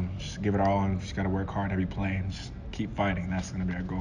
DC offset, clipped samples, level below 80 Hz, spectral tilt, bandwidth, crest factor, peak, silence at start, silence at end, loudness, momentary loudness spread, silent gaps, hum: under 0.1%; under 0.1%; -40 dBFS; -7 dB/octave; 10 kHz; 16 dB; -14 dBFS; 0 s; 0 s; -30 LUFS; 9 LU; none; none